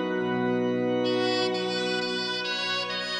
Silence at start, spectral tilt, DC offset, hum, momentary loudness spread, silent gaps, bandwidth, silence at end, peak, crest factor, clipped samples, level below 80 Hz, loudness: 0 s; -4.5 dB/octave; under 0.1%; none; 2 LU; none; 10.5 kHz; 0 s; -14 dBFS; 14 dB; under 0.1%; -70 dBFS; -27 LUFS